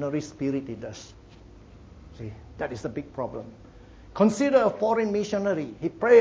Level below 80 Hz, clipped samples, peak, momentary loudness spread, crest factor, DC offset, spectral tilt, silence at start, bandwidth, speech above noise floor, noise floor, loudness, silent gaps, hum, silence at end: -52 dBFS; under 0.1%; -6 dBFS; 19 LU; 20 dB; under 0.1%; -6.5 dB/octave; 0 s; 8 kHz; 24 dB; -49 dBFS; -26 LUFS; none; none; 0 s